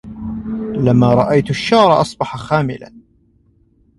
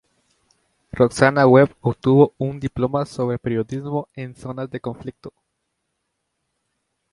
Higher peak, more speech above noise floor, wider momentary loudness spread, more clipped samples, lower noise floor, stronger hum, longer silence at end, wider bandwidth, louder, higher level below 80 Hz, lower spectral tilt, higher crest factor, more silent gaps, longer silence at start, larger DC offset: about the same, 0 dBFS vs 0 dBFS; second, 41 dB vs 56 dB; second, 14 LU vs 19 LU; neither; second, -55 dBFS vs -75 dBFS; neither; second, 1 s vs 1.85 s; about the same, 11.5 kHz vs 11.5 kHz; first, -15 LUFS vs -19 LUFS; first, -44 dBFS vs -52 dBFS; about the same, -7 dB/octave vs -7.5 dB/octave; about the same, 16 dB vs 20 dB; neither; second, 0.05 s vs 0.95 s; neither